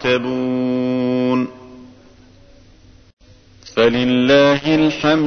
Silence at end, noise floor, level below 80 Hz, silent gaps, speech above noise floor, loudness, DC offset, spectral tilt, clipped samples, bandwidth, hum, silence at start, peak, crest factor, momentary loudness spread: 0 s; -46 dBFS; -48 dBFS; 3.13-3.17 s; 31 dB; -16 LUFS; under 0.1%; -6 dB/octave; under 0.1%; 6.6 kHz; none; 0 s; -2 dBFS; 16 dB; 8 LU